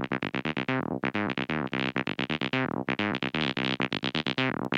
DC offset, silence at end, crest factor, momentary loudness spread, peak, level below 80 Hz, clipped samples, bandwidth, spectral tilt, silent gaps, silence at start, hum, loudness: under 0.1%; 0 s; 18 dB; 2 LU; -10 dBFS; -58 dBFS; under 0.1%; 8.8 kHz; -6 dB/octave; none; 0 s; none; -29 LUFS